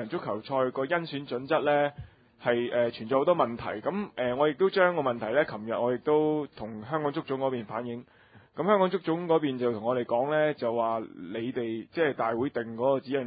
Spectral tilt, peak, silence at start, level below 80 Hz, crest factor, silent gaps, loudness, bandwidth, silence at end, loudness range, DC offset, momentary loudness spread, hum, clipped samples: -10 dB/octave; -8 dBFS; 0 s; -64 dBFS; 20 dB; none; -28 LUFS; 5 kHz; 0 s; 2 LU; under 0.1%; 9 LU; none; under 0.1%